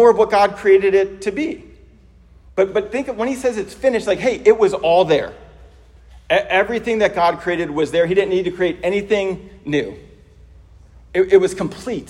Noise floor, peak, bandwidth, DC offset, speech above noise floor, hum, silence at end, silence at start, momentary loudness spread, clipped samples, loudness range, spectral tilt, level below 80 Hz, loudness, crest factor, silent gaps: -47 dBFS; 0 dBFS; 12 kHz; under 0.1%; 30 dB; none; 0.05 s; 0 s; 10 LU; under 0.1%; 4 LU; -5.5 dB/octave; -46 dBFS; -17 LUFS; 18 dB; none